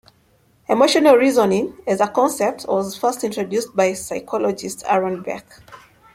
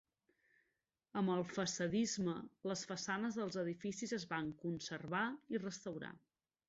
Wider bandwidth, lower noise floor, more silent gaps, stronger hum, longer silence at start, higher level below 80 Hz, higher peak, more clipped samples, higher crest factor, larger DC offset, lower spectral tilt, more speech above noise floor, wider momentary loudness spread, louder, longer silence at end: first, 16.5 kHz vs 8 kHz; second, -58 dBFS vs -88 dBFS; neither; neither; second, 0.7 s vs 1.15 s; first, -60 dBFS vs -76 dBFS; first, -2 dBFS vs -26 dBFS; neither; about the same, 18 dB vs 16 dB; neither; about the same, -4 dB/octave vs -4.5 dB/octave; second, 39 dB vs 46 dB; first, 14 LU vs 8 LU; first, -19 LUFS vs -42 LUFS; about the same, 0.4 s vs 0.5 s